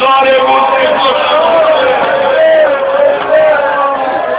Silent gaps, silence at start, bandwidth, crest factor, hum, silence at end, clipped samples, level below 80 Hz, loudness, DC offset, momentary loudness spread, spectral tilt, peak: none; 0 s; 4 kHz; 8 dB; none; 0 s; 0.2%; -50 dBFS; -9 LUFS; under 0.1%; 3 LU; -7 dB/octave; 0 dBFS